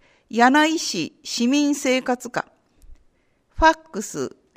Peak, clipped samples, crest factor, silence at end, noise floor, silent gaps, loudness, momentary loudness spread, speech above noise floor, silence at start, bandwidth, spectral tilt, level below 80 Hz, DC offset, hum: -2 dBFS; under 0.1%; 20 dB; 0.3 s; -62 dBFS; none; -21 LUFS; 14 LU; 42 dB; 0.35 s; 15.5 kHz; -3 dB/octave; -42 dBFS; under 0.1%; none